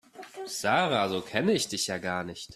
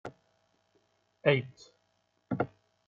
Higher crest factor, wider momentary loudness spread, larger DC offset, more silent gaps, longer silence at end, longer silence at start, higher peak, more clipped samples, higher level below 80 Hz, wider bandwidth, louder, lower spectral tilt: about the same, 22 dB vs 24 dB; second, 11 LU vs 20 LU; neither; neither; second, 0 s vs 0.4 s; about the same, 0.15 s vs 0.05 s; first, -8 dBFS vs -12 dBFS; neither; first, -66 dBFS vs -72 dBFS; first, 14 kHz vs 7.4 kHz; first, -28 LUFS vs -32 LUFS; second, -3.5 dB/octave vs -5 dB/octave